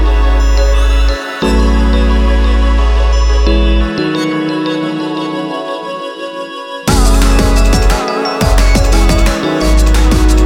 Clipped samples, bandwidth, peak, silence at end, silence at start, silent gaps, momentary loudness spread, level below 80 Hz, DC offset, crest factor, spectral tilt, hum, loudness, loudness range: under 0.1%; 15 kHz; 0 dBFS; 0 s; 0 s; none; 8 LU; -10 dBFS; under 0.1%; 10 dB; -5.5 dB/octave; none; -13 LUFS; 4 LU